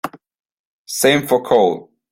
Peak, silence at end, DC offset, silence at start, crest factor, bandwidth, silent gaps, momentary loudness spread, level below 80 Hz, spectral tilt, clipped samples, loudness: 0 dBFS; 0.3 s; under 0.1%; 0.05 s; 18 dB; 16.5 kHz; 0.39-0.44 s, 0.52-0.85 s; 15 LU; -60 dBFS; -3.5 dB/octave; under 0.1%; -16 LUFS